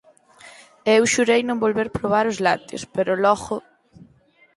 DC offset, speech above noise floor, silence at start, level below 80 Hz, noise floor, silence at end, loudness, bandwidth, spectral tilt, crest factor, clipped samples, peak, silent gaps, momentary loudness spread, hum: under 0.1%; 37 dB; 0.45 s; -54 dBFS; -57 dBFS; 0.55 s; -20 LUFS; 11.5 kHz; -4 dB/octave; 18 dB; under 0.1%; -4 dBFS; none; 10 LU; none